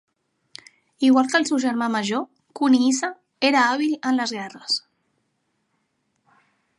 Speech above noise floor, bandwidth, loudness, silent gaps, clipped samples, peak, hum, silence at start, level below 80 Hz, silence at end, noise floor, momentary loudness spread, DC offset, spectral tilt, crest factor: 52 dB; 11 kHz; -21 LUFS; none; under 0.1%; -4 dBFS; none; 1 s; -76 dBFS; 2 s; -72 dBFS; 10 LU; under 0.1%; -3 dB/octave; 18 dB